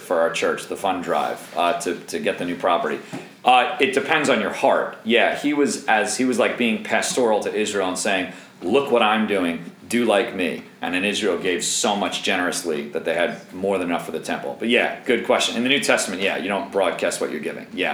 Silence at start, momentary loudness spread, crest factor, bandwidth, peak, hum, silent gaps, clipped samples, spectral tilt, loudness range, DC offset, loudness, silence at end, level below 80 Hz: 0 s; 8 LU; 20 dB; over 20 kHz; -2 dBFS; none; none; under 0.1%; -3 dB/octave; 3 LU; under 0.1%; -21 LUFS; 0 s; -68 dBFS